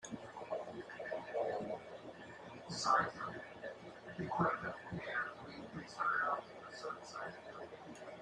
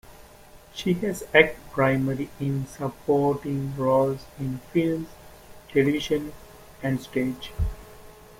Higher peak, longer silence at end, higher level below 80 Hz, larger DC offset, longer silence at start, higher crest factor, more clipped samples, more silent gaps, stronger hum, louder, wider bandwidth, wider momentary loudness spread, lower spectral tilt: second, -20 dBFS vs -2 dBFS; second, 0 s vs 0.3 s; second, -76 dBFS vs -44 dBFS; neither; about the same, 0 s vs 0.1 s; about the same, 22 dB vs 24 dB; neither; neither; neither; second, -41 LUFS vs -25 LUFS; second, 11.5 kHz vs 16.5 kHz; first, 16 LU vs 11 LU; second, -4.5 dB/octave vs -6.5 dB/octave